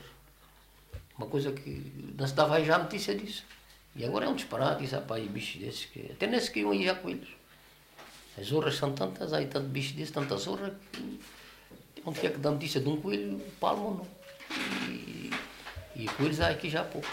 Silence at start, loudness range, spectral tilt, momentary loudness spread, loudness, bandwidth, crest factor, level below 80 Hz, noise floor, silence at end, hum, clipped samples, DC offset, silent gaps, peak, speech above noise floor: 0 s; 4 LU; -5 dB/octave; 20 LU; -33 LUFS; 16 kHz; 24 dB; -58 dBFS; -59 dBFS; 0 s; none; under 0.1%; under 0.1%; none; -10 dBFS; 27 dB